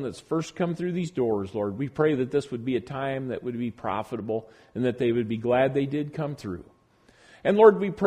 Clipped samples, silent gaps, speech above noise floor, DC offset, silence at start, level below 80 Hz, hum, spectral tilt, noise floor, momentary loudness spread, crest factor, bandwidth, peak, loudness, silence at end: under 0.1%; none; 34 dB; under 0.1%; 0 s; -60 dBFS; none; -7.5 dB/octave; -60 dBFS; 12 LU; 22 dB; 10.5 kHz; -4 dBFS; -26 LUFS; 0 s